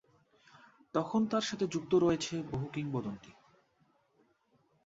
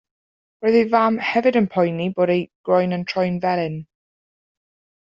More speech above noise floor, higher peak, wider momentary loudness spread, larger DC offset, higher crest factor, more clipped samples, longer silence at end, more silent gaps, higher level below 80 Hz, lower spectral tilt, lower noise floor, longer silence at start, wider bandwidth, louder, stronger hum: second, 40 dB vs over 71 dB; second, -16 dBFS vs -4 dBFS; first, 10 LU vs 6 LU; neither; about the same, 20 dB vs 18 dB; neither; first, 1.55 s vs 1.15 s; second, none vs 2.55-2.64 s; second, -68 dBFS vs -62 dBFS; about the same, -5.5 dB/octave vs -5.5 dB/octave; second, -72 dBFS vs under -90 dBFS; first, 0.95 s vs 0.6 s; about the same, 8 kHz vs 7.6 kHz; second, -34 LUFS vs -20 LUFS; neither